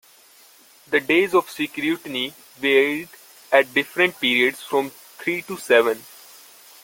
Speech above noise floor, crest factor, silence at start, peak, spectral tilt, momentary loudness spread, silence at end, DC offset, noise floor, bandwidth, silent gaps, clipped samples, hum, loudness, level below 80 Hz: 31 dB; 22 dB; 0.9 s; -2 dBFS; -3.5 dB/octave; 11 LU; 0.85 s; under 0.1%; -51 dBFS; 17 kHz; none; under 0.1%; none; -21 LUFS; -68 dBFS